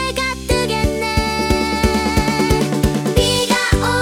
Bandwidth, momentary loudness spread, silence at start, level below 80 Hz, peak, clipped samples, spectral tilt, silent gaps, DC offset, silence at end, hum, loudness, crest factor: 18 kHz; 3 LU; 0 s; -26 dBFS; 0 dBFS; under 0.1%; -4.5 dB/octave; none; under 0.1%; 0 s; none; -17 LUFS; 16 dB